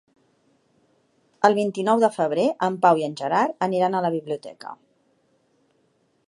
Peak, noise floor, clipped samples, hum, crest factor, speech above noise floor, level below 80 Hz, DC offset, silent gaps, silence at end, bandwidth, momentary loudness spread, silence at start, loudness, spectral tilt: -2 dBFS; -66 dBFS; under 0.1%; none; 22 dB; 45 dB; -76 dBFS; under 0.1%; none; 1.55 s; 11.5 kHz; 13 LU; 1.4 s; -22 LUFS; -6 dB/octave